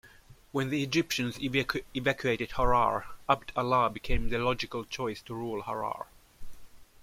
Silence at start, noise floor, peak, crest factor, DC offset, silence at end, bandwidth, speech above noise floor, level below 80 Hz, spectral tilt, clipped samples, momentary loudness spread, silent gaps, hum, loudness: 0.05 s; -55 dBFS; -8 dBFS; 22 dB; under 0.1%; 0.2 s; 16 kHz; 26 dB; -42 dBFS; -5 dB/octave; under 0.1%; 9 LU; none; none; -30 LUFS